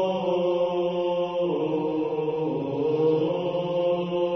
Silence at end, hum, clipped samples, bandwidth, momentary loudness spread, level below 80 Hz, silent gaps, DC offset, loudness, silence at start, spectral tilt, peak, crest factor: 0 s; none; under 0.1%; 6.2 kHz; 4 LU; -64 dBFS; none; under 0.1%; -25 LUFS; 0 s; -8 dB/octave; -12 dBFS; 12 dB